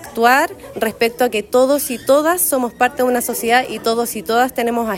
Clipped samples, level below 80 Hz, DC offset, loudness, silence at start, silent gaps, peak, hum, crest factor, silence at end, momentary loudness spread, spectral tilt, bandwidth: under 0.1%; -52 dBFS; under 0.1%; -16 LUFS; 0 s; none; -2 dBFS; none; 16 dB; 0 s; 6 LU; -2.5 dB/octave; 16.5 kHz